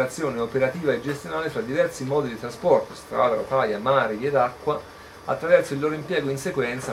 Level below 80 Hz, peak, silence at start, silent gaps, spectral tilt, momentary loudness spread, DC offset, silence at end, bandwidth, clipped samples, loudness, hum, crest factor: -56 dBFS; -4 dBFS; 0 s; none; -5.5 dB/octave; 8 LU; under 0.1%; 0 s; 15.5 kHz; under 0.1%; -24 LUFS; none; 18 dB